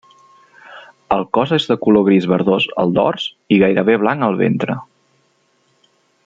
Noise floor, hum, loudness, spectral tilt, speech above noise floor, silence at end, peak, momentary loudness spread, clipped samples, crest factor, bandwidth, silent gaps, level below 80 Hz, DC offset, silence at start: -60 dBFS; none; -16 LUFS; -7.5 dB/octave; 46 dB; 1.45 s; -2 dBFS; 8 LU; under 0.1%; 16 dB; 7.6 kHz; none; -56 dBFS; under 0.1%; 0.7 s